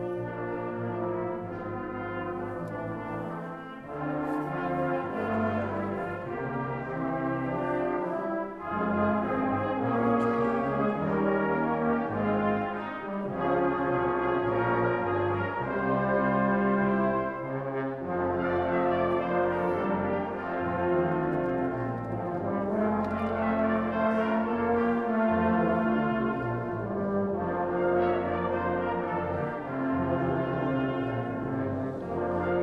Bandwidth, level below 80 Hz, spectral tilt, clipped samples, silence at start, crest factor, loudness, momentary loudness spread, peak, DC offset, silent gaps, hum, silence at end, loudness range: 5.8 kHz; -54 dBFS; -9.5 dB/octave; under 0.1%; 0 s; 16 dB; -29 LUFS; 8 LU; -12 dBFS; under 0.1%; none; none; 0 s; 5 LU